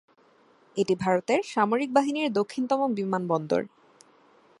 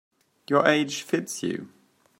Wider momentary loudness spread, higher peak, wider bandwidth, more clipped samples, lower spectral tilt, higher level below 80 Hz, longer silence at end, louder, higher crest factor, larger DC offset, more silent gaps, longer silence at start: second, 5 LU vs 11 LU; second, -8 dBFS vs -4 dBFS; second, 11.5 kHz vs 16.5 kHz; neither; first, -6 dB/octave vs -4 dB/octave; first, -68 dBFS vs -74 dBFS; first, 0.95 s vs 0.55 s; about the same, -26 LUFS vs -25 LUFS; about the same, 20 dB vs 22 dB; neither; neither; first, 0.75 s vs 0.5 s